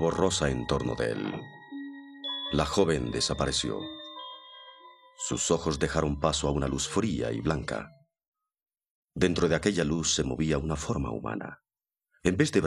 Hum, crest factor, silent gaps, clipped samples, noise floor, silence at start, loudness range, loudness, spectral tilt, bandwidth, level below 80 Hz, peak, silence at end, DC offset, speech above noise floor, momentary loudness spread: none; 22 dB; 8.28-8.32 s, 8.91-9.08 s; under 0.1%; under -90 dBFS; 0 s; 2 LU; -29 LUFS; -4.5 dB/octave; 13 kHz; -44 dBFS; -8 dBFS; 0 s; under 0.1%; over 62 dB; 16 LU